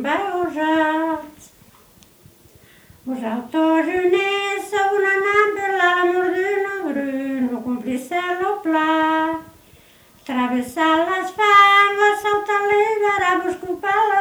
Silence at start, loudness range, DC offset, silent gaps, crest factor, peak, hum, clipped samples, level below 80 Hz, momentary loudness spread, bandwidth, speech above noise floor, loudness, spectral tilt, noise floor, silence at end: 0 s; 8 LU; under 0.1%; none; 18 dB; -2 dBFS; none; under 0.1%; -60 dBFS; 10 LU; over 20 kHz; 32 dB; -18 LUFS; -3.5 dB/octave; -50 dBFS; 0 s